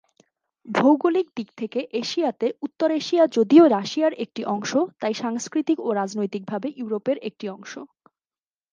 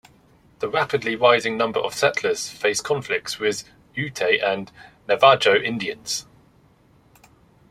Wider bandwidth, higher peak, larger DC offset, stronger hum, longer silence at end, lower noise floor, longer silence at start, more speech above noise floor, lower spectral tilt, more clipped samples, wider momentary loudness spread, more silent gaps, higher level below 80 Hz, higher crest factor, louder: second, 7.4 kHz vs 15 kHz; about the same, -4 dBFS vs -2 dBFS; neither; neither; second, 0.85 s vs 1.5 s; first, under -90 dBFS vs -56 dBFS; about the same, 0.65 s vs 0.6 s; first, over 68 dB vs 35 dB; first, -5 dB/octave vs -3 dB/octave; neither; about the same, 14 LU vs 13 LU; neither; second, -78 dBFS vs -62 dBFS; about the same, 20 dB vs 20 dB; about the same, -22 LUFS vs -21 LUFS